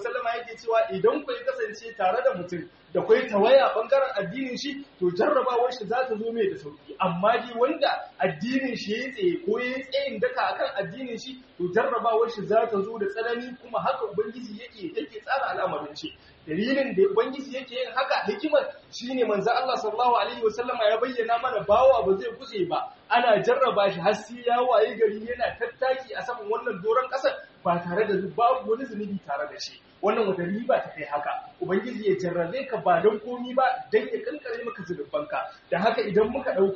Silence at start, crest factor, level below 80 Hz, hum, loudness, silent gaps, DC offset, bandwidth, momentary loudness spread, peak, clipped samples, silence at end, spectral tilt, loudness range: 0 s; 18 dB; -64 dBFS; none; -26 LUFS; none; under 0.1%; 7.2 kHz; 11 LU; -8 dBFS; under 0.1%; 0 s; -3.5 dB/octave; 5 LU